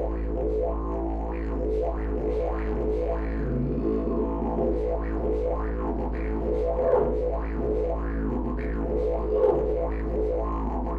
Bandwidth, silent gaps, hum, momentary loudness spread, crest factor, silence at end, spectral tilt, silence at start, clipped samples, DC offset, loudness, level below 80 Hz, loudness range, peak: 4.5 kHz; none; none; 6 LU; 16 dB; 0 s; -10.5 dB/octave; 0 s; under 0.1%; under 0.1%; -28 LUFS; -30 dBFS; 2 LU; -10 dBFS